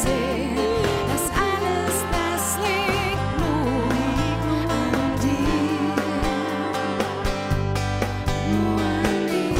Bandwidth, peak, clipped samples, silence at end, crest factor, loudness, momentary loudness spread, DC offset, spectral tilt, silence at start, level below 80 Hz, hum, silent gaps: 16 kHz; -6 dBFS; under 0.1%; 0 s; 16 dB; -23 LUFS; 3 LU; under 0.1%; -5 dB/octave; 0 s; -34 dBFS; none; none